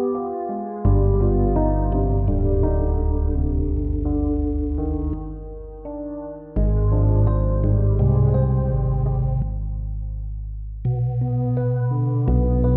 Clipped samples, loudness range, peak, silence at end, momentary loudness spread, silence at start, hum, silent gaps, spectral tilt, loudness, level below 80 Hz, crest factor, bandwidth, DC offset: under 0.1%; 5 LU; -6 dBFS; 0 s; 13 LU; 0 s; none; none; -13 dB/octave; -22 LUFS; -24 dBFS; 14 dB; 2 kHz; under 0.1%